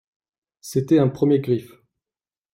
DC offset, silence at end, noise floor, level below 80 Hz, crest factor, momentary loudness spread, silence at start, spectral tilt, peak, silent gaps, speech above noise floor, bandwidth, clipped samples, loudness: under 0.1%; 0.85 s; under -90 dBFS; -62 dBFS; 16 dB; 9 LU; 0.65 s; -8 dB/octave; -6 dBFS; none; over 71 dB; 16 kHz; under 0.1%; -21 LUFS